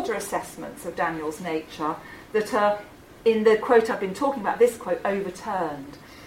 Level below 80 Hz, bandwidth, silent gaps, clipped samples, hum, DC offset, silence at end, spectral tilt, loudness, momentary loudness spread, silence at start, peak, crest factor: -58 dBFS; 16 kHz; none; under 0.1%; none; under 0.1%; 0 s; -5 dB/octave; -25 LUFS; 13 LU; 0 s; -4 dBFS; 20 dB